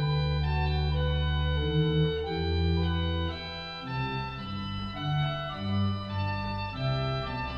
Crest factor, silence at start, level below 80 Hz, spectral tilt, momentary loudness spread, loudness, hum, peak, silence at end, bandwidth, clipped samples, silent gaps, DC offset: 14 dB; 0 s; -36 dBFS; -8 dB/octave; 8 LU; -30 LUFS; none; -16 dBFS; 0 s; 6.4 kHz; under 0.1%; none; under 0.1%